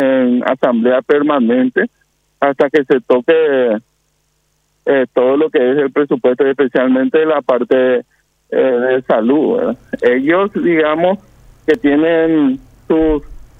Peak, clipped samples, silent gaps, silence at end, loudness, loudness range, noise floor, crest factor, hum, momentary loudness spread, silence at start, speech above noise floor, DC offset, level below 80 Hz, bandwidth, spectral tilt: 0 dBFS; under 0.1%; none; 0.15 s; -14 LUFS; 2 LU; -62 dBFS; 12 dB; none; 6 LU; 0 s; 49 dB; under 0.1%; -42 dBFS; 5.2 kHz; -7.5 dB/octave